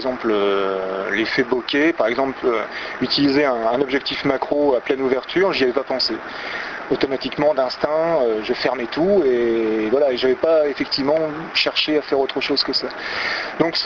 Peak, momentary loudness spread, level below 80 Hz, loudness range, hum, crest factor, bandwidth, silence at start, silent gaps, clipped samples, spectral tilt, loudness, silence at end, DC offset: -4 dBFS; 5 LU; -54 dBFS; 2 LU; none; 16 dB; 7.4 kHz; 0 s; none; under 0.1%; -5 dB/octave; -19 LUFS; 0 s; under 0.1%